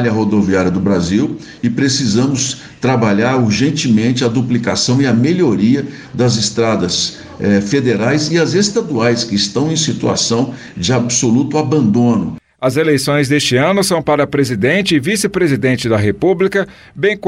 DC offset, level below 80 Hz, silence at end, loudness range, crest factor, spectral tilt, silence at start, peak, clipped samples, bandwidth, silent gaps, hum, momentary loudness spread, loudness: under 0.1%; -46 dBFS; 0 s; 1 LU; 12 dB; -5 dB/octave; 0 s; -2 dBFS; under 0.1%; 15.5 kHz; none; none; 5 LU; -14 LUFS